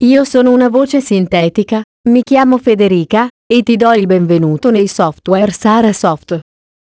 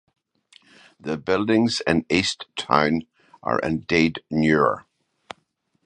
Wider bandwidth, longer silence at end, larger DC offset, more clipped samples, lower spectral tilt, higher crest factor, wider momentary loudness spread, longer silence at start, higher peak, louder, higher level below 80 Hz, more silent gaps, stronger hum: second, 8 kHz vs 9.8 kHz; second, 0.4 s vs 1.05 s; neither; first, 0.3% vs under 0.1%; first, -6.5 dB/octave vs -5 dB/octave; second, 10 dB vs 22 dB; second, 6 LU vs 16 LU; second, 0 s vs 1.05 s; about the same, 0 dBFS vs -2 dBFS; first, -11 LUFS vs -22 LUFS; about the same, -48 dBFS vs -52 dBFS; first, 1.84-2.04 s, 3.30-3.50 s vs none; neither